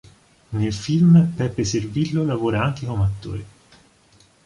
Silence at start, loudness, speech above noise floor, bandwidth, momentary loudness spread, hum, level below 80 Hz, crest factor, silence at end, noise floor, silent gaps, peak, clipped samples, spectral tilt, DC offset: 0.5 s; -20 LUFS; 36 dB; 10.5 kHz; 16 LU; none; -42 dBFS; 16 dB; 1 s; -55 dBFS; none; -4 dBFS; under 0.1%; -7 dB/octave; under 0.1%